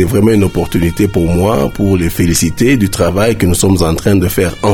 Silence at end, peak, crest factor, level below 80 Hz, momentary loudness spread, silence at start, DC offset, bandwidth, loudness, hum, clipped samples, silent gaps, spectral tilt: 0 s; 0 dBFS; 10 dB; -26 dBFS; 3 LU; 0 s; under 0.1%; 18 kHz; -12 LUFS; none; under 0.1%; none; -5.5 dB/octave